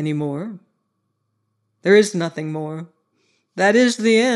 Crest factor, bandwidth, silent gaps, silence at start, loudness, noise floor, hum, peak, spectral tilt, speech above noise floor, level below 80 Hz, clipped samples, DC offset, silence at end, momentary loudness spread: 18 dB; 12 kHz; none; 0 s; -18 LUFS; -72 dBFS; none; -2 dBFS; -5 dB/octave; 55 dB; -78 dBFS; under 0.1%; under 0.1%; 0 s; 17 LU